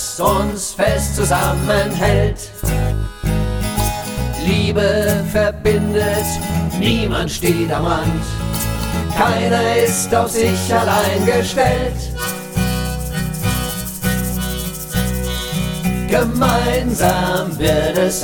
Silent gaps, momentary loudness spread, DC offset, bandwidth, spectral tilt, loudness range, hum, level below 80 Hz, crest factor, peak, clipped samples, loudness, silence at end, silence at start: none; 6 LU; under 0.1%; 18 kHz; -5 dB/octave; 4 LU; none; -26 dBFS; 16 dB; -2 dBFS; under 0.1%; -17 LUFS; 0 s; 0 s